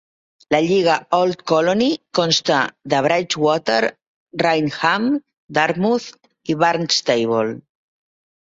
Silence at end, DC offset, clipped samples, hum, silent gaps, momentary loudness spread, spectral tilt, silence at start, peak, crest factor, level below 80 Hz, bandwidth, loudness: 0.85 s; under 0.1%; under 0.1%; none; 4.07-4.26 s, 5.37-5.48 s; 8 LU; -4 dB/octave; 0.5 s; -2 dBFS; 18 dB; -60 dBFS; 8 kHz; -18 LUFS